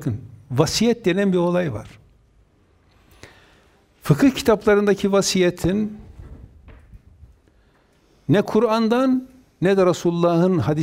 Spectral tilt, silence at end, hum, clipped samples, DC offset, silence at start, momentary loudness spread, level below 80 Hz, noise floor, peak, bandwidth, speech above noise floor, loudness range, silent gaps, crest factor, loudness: -6 dB/octave; 0 s; none; under 0.1%; under 0.1%; 0 s; 11 LU; -48 dBFS; -58 dBFS; 0 dBFS; 16 kHz; 40 dB; 5 LU; none; 20 dB; -19 LUFS